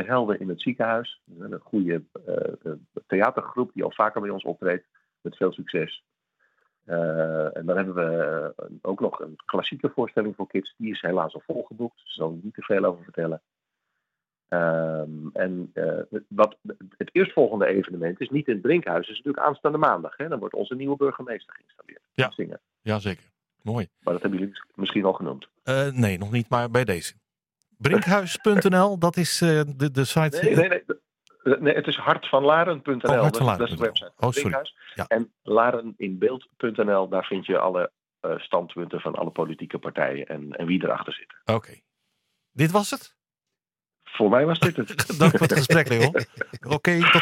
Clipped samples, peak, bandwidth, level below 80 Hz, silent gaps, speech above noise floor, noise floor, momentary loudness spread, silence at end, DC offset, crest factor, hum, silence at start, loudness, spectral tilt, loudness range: under 0.1%; 0 dBFS; 16.5 kHz; -64 dBFS; none; 64 dB; -88 dBFS; 14 LU; 0 s; under 0.1%; 24 dB; none; 0 s; -24 LUFS; -5.5 dB/octave; 7 LU